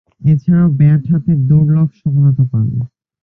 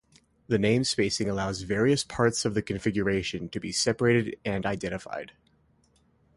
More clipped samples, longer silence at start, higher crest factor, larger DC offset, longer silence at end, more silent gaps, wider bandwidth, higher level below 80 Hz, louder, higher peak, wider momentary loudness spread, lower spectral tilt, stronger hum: neither; second, 0.2 s vs 0.5 s; second, 10 dB vs 18 dB; neither; second, 0.35 s vs 1.1 s; neither; second, 2.8 kHz vs 11.5 kHz; first, -42 dBFS vs -52 dBFS; first, -13 LUFS vs -27 LUFS; first, -2 dBFS vs -10 dBFS; about the same, 7 LU vs 9 LU; first, -13 dB/octave vs -4.5 dB/octave; neither